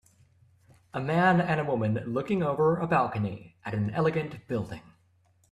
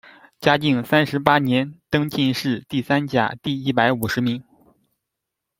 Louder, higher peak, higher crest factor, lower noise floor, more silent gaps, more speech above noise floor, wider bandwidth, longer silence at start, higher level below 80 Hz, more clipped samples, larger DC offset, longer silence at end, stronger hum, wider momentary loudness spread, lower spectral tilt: second, -28 LUFS vs -20 LUFS; second, -10 dBFS vs 0 dBFS; about the same, 20 dB vs 20 dB; second, -65 dBFS vs -82 dBFS; neither; second, 38 dB vs 62 dB; second, 10.5 kHz vs 16.5 kHz; first, 0.95 s vs 0.4 s; second, -62 dBFS vs -56 dBFS; neither; neither; second, 0.7 s vs 1.2 s; neither; first, 12 LU vs 6 LU; first, -8 dB/octave vs -6 dB/octave